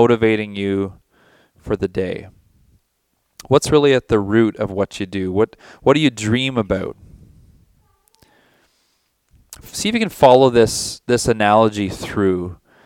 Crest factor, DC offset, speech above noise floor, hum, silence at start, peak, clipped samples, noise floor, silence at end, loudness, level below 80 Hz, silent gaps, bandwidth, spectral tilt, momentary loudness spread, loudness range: 18 dB; under 0.1%; 52 dB; none; 0 s; 0 dBFS; under 0.1%; -68 dBFS; 0.3 s; -17 LUFS; -46 dBFS; none; 17 kHz; -5 dB/octave; 11 LU; 11 LU